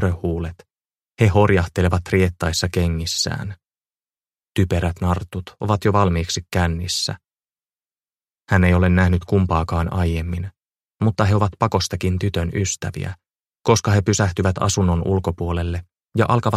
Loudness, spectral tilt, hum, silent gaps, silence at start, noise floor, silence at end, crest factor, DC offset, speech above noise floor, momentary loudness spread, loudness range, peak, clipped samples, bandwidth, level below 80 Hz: -20 LUFS; -5.5 dB/octave; none; none; 0 s; under -90 dBFS; 0 s; 20 dB; under 0.1%; over 71 dB; 11 LU; 3 LU; 0 dBFS; under 0.1%; 14 kHz; -36 dBFS